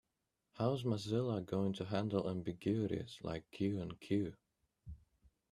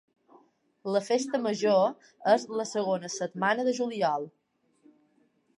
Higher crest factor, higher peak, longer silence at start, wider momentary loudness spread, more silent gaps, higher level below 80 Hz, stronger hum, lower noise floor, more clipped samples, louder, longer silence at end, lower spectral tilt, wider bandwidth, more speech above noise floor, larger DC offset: about the same, 20 dB vs 20 dB; second, -20 dBFS vs -10 dBFS; second, 0.55 s vs 0.85 s; about the same, 8 LU vs 9 LU; neither; first, -66 dBFS vs -84 dBFS; neither; first, -87 dBFS vs -69 dBFS; neither; second, -39 LUFS vs -28 LUFS; second, 0.55 s vs 1.3 s; first, -7.5 dB/octave vs -4.5 dB/octave; first, 13 kHz vs 11.5 kHz; first, 49 dB vs 41 dB; neither